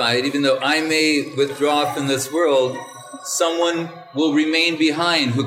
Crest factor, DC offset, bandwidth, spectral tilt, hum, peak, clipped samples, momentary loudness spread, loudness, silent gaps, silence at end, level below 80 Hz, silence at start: 14 dB; under 0.1%; 16.5 kHz; -3.5 dB/octave; none; -6 dBFS; under 0.1%; 8 LU; -19 LUFS; none; 0 s; -74 dBFS; 0 s